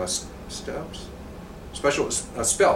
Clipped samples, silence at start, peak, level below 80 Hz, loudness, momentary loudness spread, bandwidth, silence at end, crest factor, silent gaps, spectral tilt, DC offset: under 0.1%; 0 s; -8 dBFS; -44 dBFS; -26 LUFS; 17 LU; 16.5 kHz; 0 s; 18 dB; none; -2.5 dB/octave; under 0.1%